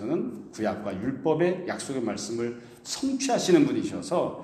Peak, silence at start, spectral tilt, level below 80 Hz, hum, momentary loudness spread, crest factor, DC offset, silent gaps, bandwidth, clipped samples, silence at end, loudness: -8 dBFS; 0 s; -5 dB/octave; -64 dBFS; none; 11 LU; 20 dB; under 0.1%; none; 13.5 kHz; under 0.1%; 0 s; -27 LUFS